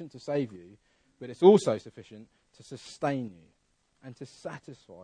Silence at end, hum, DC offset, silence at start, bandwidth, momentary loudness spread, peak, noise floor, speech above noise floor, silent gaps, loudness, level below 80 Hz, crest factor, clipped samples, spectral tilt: 0 s; none; under 0.1%; 0 s; 10 kHz; 27 LU; -6 dBFS; -72 dBFS; 43 dB; none; -26 LUFS; -72 dBFS; 24 dB; under 0.1%; -6.5 dB/octave